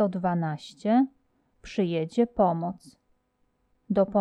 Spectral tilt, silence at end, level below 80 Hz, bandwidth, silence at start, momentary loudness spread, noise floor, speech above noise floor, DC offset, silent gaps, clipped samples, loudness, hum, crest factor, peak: -8 dB/octave; 0 s; -58 dBFS; 10.5 kHz; 0 s; 10 LU; -72 dBFS; 46 dB; under 0.1%; none; under 0.1%; -27 LUFS; none; 16 dB; -10 dBFS